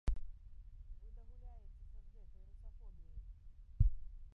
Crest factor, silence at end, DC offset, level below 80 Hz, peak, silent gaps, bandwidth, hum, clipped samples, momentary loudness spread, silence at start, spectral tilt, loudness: 24 dB; 0 s; under 0.1%; -44 dBFS; -18 dBFS; none; 3.2 kHz; none; under 0.1%; 23 LU; 0.05 s; -9.5 dB/octave; -43 LUFS